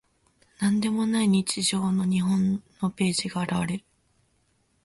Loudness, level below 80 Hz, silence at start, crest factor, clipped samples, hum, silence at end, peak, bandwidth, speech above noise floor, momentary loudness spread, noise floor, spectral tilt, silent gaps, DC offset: -25 LUFS; -60 dBFS; 0.6 s; 16 dB; under 0.1%; none; 1.05 s; -12 dBFS; 11.5 kHz; 44 dB; 6 LU; -68 dBFS; -5 dB/octave; none; under 0.1%